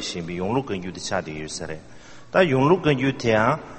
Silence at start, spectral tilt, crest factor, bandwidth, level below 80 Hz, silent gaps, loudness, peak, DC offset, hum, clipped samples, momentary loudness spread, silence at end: 0 s; -5.5 dB/octave; 20 dB; 8.8 kHz; -50 dBFS; none; -23 LUFS; -2 dBFS; under 0.1%; none; under 0.1%; 13 LU; 0 s